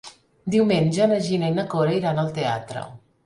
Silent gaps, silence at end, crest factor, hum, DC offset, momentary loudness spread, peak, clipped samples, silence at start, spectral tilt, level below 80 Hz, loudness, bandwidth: none; 0.3 s; 16 dB; none; under 0.1%; 15 LU; -8 dBFS; under 0.1%; 0.05 s; -6.5 dB/octave; -58 dBFS; -22 LUFS; 11.5 kHz